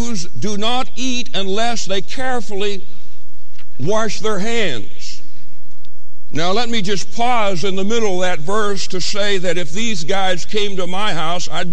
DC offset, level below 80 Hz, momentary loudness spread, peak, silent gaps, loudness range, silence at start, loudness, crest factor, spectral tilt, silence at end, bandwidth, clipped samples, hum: 40%; -44 dBFS; 6 LU; -2 dBFS; none; 4 LU; 0 s; -20 LUFS; 14 dB; -3.5 dB/octave; 0 s; 11.5 kHz; under 0.1%; 60 Hz at -50 dBFS